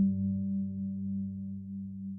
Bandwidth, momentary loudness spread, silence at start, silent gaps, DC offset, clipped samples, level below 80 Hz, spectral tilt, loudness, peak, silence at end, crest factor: 0.6 kHz; 8 LU; 0 s; none; under 0.1%; under 0.1%; -64 dBFS; -18 dB/octave; -35 LUFS; -20 dBFS; 0 s; 14 dB